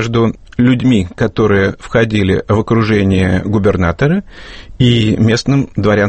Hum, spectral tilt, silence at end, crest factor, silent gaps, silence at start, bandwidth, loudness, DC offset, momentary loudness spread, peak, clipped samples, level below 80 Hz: none; -7 dB/octave; 0 s; 12 dB; none; 0 s; 8.6 kHz; -13 LUFS; under 0.1%; 4 LU; 0 dBFS; under 0.1%; -34 dBFS